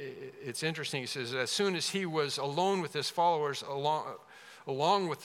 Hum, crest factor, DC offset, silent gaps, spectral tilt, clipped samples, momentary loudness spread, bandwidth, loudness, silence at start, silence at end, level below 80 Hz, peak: none; 18 dB; under 0.1%; none; -3.5 dB/octave; under 0.1%; 15 LU; 16.5 kHz; -32 LUFS; 0 s; 0 s; -88 dBFS; -16 dBFS